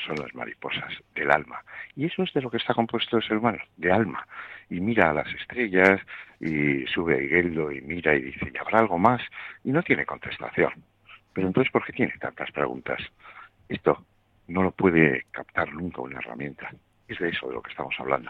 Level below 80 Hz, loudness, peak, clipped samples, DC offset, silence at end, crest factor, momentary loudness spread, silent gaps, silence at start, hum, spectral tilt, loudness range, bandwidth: -56 dBFS; -26 LUFS; -2 dBFS; under 0.1%; under 0.1%; 0 s; 24 dB; 14 LU; none; 0 s; none; -7.5 dB/octave; 4 LU; 8.4 kHz